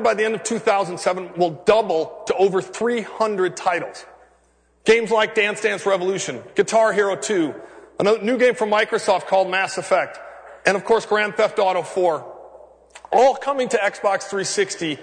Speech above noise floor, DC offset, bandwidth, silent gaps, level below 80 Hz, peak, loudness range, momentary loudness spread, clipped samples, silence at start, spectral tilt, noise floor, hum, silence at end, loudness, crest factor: 40 dB; under 0.1%; 9.6 kHz; none; -62 dBFS; -2 dBFS; 2 LU; 8 LU; under 0.1%; 0 s; -3.5 dB/octave; -59 dBFS; none; 0 s; -20 LUFS; 18 dB